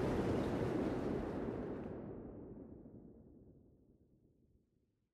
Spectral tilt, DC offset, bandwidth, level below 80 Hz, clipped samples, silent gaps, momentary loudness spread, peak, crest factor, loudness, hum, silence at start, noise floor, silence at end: -8 dB/octave; under 0.1%; 14.5 kHz; -58 dBFS; under 0.1%; none; 21 LU; -24 dBFS; 18 dB; -41 LUFS; none; 0 s; -80 dBFS; 1.55 s